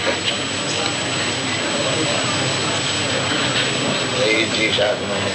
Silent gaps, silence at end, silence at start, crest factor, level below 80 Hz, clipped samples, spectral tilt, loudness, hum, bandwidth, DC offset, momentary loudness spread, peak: none; 0 s; 0 s; 16 dB; -52 dBFS; under 0.1%; -2.5 dB/octave; -18 LUFS; none; 11 kHz; under 0.1%; 3 LU; -4 dBFS